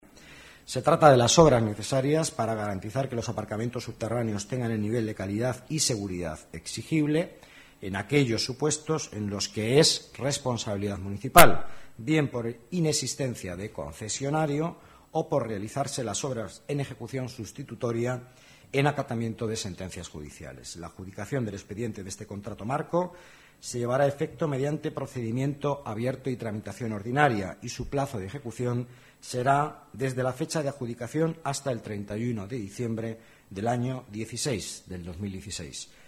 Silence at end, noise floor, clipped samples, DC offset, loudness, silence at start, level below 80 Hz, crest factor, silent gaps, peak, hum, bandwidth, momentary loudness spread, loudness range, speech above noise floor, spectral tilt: 0 s; -50 dBFS; under 0.1%; under 0.1%; -28 LUFS; 0.25 s; -52 dBFS; 28 dB; none; 0 dBFS; none; 16 kHz; 14 LU; 9 LU; 23 dB; -4.5 dB/octave